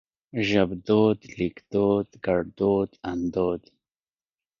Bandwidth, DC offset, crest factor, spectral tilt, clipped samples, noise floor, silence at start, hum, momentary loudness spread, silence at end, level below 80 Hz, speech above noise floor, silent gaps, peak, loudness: 7.2 kHz; under 0.1%; 18 dB; -7.5 dB/octave; under 0.1%; under -90 dBFS; 0.35 s; none; 9 LU; 1 s; -52 dBFS; over 66 dB; none; -8 dBFS; -25 LUFS